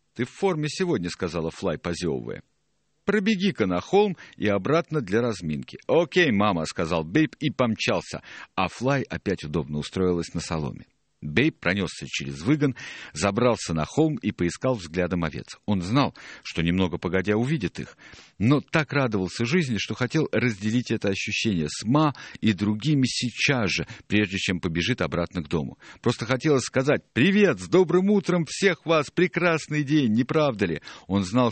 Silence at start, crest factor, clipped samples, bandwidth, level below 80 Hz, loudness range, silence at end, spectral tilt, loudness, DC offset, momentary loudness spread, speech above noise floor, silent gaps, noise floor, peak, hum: 0.15 s; 20 dB; under 0.1%; 8.8 kHz; -52 dBFS; 5 LU; 0 s; -5.5 dB/octave; -25 LUFS; under 0.1%; 8 LU; 49 dB; none; -74 dBFS; -4 dBFS; none